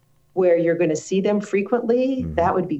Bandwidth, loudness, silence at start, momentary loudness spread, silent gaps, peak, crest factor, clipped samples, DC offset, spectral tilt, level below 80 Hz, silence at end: 8.4 kHz; -21 LUFS; 0.35 s; 4 LU; none; -6 dBFS; 14 dB; under 0.1%; under 0.1%; -6.5 dB/octave; -48 dBFS; 0 s